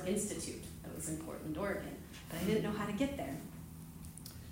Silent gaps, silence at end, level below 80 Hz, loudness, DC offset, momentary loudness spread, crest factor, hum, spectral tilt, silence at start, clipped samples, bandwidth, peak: none; 0 s; -58 dBFS; -40 LUFS; under 0.1%; 14 LU; 18 dB; none; -5 dB/octave; 0 s; under 0.1%; 16 kHz; -22 dBFS